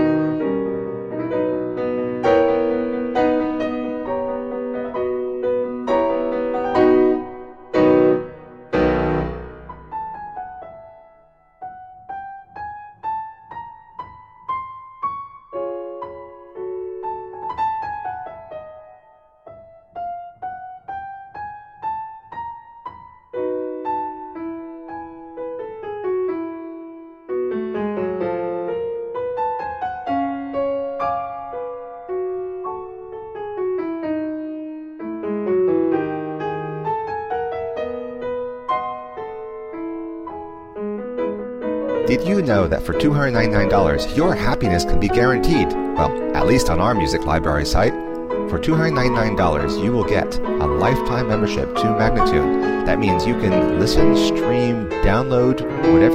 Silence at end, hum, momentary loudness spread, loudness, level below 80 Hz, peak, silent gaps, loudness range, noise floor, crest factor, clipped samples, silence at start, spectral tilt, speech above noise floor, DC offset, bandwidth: 0 s; none; 17 LU; -21 LUFS; -34 dBFS; -2 dBFS; none; 14 LU; -53 dBFS; 18 dB; under 0.1%; 0 s; -6.5 dB/octave; 36 dB; under 0.1%; 15.5 kHz